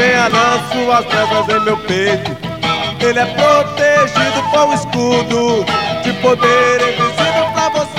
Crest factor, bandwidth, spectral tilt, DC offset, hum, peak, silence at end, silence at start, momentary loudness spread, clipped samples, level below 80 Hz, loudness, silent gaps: 14 dB; 16 kHz; -4 dB/octave; 0.4%; none; 0 dBFS; 0 s; 0 s; 5 LU; under 0.1%; -46 dBFS; -13 LUFS; none